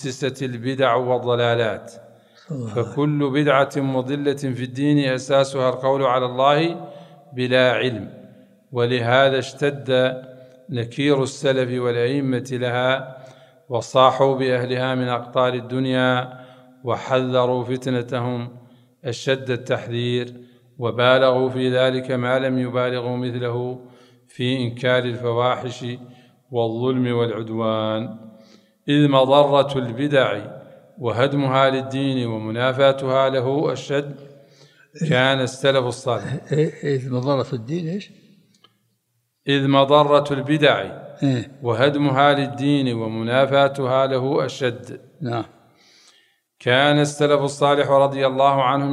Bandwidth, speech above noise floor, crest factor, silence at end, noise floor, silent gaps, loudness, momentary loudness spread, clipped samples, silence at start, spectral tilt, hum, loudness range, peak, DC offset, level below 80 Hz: 11.5 kHz; 51 dB; 20 dB; 0 s; -71 dBFS; none; -20 LUFS; 12 LU; under 0.1%; 0 s; -6 dB/octave; none; 5 LU; 0 dBFS; under 0.1%; -66 dBFS